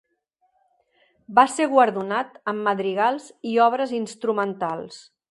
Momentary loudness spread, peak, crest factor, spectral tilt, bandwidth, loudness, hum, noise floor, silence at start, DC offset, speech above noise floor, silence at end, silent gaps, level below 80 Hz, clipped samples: 10 LU; -2 dBFS; 20 dB; -4.5 dB/octave; 11.5 kHz; -22 LUFS; none; -70 dBFS; 1.3 s; under 0.1%; 48 dB; 0.3 s; none; -74 dBFS; under 0.1%